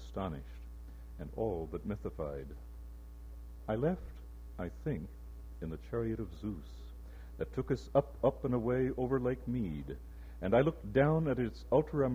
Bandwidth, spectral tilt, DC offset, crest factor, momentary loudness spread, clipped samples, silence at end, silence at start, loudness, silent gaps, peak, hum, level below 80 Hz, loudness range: 16 kHz; -9 dB/octave; under 0.1%; 22 dB; 20 LU; under 0.1%; 0 s; 0 s; -35 LUFS; none; -14 dBFS; none; -48 dBFS; 9 LU